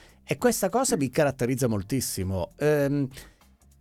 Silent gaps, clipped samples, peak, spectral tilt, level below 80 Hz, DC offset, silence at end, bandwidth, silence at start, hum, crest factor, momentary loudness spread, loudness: none; under 0.1%; -8 dBFS; -5 dB/octave; -54 dBFS; under 0.1%; 0.5 s; 17.5 kHz; 0.3 s; none; 18 dB; 6 LU; -26 LUFS